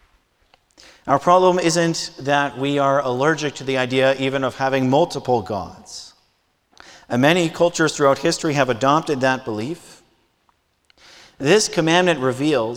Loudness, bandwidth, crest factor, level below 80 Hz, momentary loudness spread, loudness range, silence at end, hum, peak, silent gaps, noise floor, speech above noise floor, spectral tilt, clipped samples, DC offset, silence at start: -19 LUFS; 16.5 kHz; 20 dB; -56 dBFS; 11 LU; 3 LU; 0 s; none; 0 dBFS; none; -65 dBFS; 46 dB; -4.5 dB/octave; under 0.1%; under 0.1%; 1.05 s